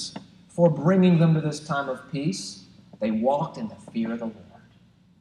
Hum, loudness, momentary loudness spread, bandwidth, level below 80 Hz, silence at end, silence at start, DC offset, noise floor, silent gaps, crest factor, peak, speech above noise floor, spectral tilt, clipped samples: none; -24 LUFS; 18 LU; 10.5 kHz; -64 dBFS; 0.8 s; 0 s; under 0.1%; -57 dBFS; none; 18 dB; -8 dBFS; 34 dB; -7 dB/octave; under 0.1%